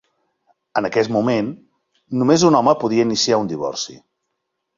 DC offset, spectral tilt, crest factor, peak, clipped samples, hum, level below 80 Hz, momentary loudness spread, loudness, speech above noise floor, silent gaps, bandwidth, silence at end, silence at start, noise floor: under 0.1%; -4.5 dB/octave; 18 dB; -2 dBFS; under 0.1%; none; -58 dBFS; 13 LU; -18 LUFS; 59 dB; none; 7.6 kHz; 0.85 s; 0.75 s; -76 dBFS